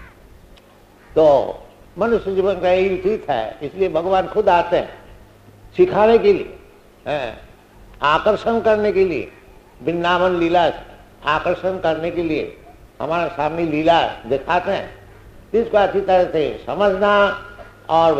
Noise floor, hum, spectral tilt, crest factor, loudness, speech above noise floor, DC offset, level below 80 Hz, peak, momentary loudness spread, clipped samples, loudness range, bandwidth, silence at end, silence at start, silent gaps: -48 dBFS; none; -6.5 dB/octave; 16 dB; -18 LUFS; 31 dB; under 0.1%; -44 dBFS; -2 dBFS; 14 LU; under 0.1%; 3 LU; 9.2 kHz; 0 s; 0 s; none